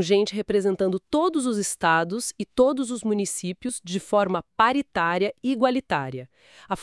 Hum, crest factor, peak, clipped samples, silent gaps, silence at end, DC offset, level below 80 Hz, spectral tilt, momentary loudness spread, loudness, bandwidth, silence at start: none; 20 dB; -4 dBFS; under 0.1%; none; 0 s; under 0.1%; -58 dBFS; -4.5 dB/octave; 8 LU; -24 LUFS; 12 kHz; 0 s